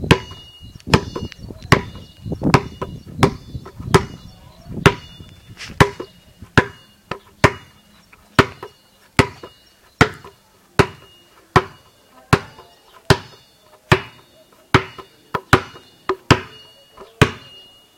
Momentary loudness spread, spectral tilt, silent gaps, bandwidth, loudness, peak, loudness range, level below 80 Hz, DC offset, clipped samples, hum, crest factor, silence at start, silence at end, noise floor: 20 LU; -5.5 dB/octave; none; 17 kHz; -19 LUFS; 0 dBFS; 2 LU; -38 dBFS; under 0.1%; under 0.1%; none; 22 dB; 0 s; 0.6 s; -52 dBFS